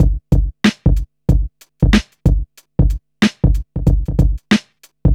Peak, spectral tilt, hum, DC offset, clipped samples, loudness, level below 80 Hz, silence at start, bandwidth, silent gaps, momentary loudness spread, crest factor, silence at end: 0 dBFS; -6.5 dB/octave; none; under 0.1%; under 0.1%; -17 LUFS; -18 dBFS; 0 s; 11 kHz; none; 5 LU; 14 dB; 0 s